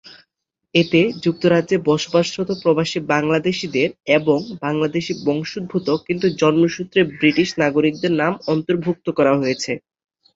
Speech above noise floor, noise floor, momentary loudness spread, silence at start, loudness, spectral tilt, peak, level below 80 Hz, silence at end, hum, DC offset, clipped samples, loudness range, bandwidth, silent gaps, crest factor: 56 dB; -74 dBFS; 6 LU; 0.05 s; -19 LUFS; -5.5 dB/octave; -2 dBFS; -58 dBFS; 0.55 s; none; under 0.1%; under 0.1%; 2 LU; 7.8 kHz; none; 16 dB